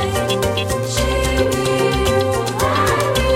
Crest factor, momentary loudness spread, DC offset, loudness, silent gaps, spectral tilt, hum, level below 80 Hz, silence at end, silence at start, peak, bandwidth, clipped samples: 12 dB; 3 LU; under 0.1%; -17 LUFS; none; -4.5 dB/octave; none; -28 dBFS; 0 s; 0 s; -4 dBFS; 16.5 kHz; under 0.1%